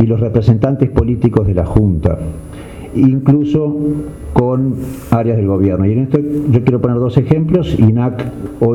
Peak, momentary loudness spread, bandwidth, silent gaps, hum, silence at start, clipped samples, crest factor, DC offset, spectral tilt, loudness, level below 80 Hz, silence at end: -2 dBFS; 10 LU; 10.5 kHz; none; none; 0 s; under 0.1%; 12 dB; under 0.1%; -10 dB/octave; -14 LUFS; -30 dBFS; 0 s